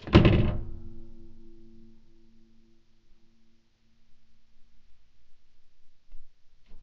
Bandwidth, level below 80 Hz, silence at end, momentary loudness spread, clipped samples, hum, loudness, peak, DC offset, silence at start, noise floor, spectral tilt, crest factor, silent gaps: 7 kHz; -38 dBFS; 0 s; 30 LU; under 0.1%; none; -24 LUFS; 0 dBFS; under 0.1%; 0 s; -60 dBFS; -6.5 dB/octave; 30 dB; none